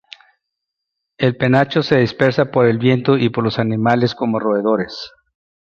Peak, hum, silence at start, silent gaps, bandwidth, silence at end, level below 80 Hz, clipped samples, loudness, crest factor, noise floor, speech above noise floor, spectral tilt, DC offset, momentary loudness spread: -2 dBFS; none; 1.2 s; none; 7 kHz; 0.6 s; -54 dBFS; under 0.1%; -16 LUFS; 16 dB; -79 dBFS; 64 dB; -8 dB/octave; under 0.1%; 5 LU